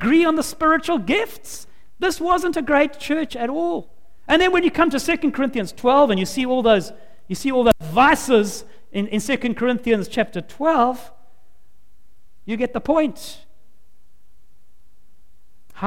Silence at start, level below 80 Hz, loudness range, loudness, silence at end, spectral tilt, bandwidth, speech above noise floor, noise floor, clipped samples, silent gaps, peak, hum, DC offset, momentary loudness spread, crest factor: 0 s; -46 dBFS; 9 LU; -19 LUFS; 0 s; -4.5 dB/octave; 17 kHz; 40 dB; -59 dBFS; under 0.1%; none; -2 dBFS; none; 2%; 14 LU; 18 dB